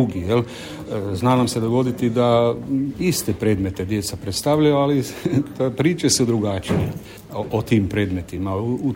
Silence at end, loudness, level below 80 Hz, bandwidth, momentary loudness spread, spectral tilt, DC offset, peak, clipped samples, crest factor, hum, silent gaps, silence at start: 0 s; -21 LUFS; -46 dBFS; 16.5 kHz; 9 LU; -5.5 dB/octave; under 0.1%; -4 dBFS; under 0.1%; 16 dB; none; none; 0 s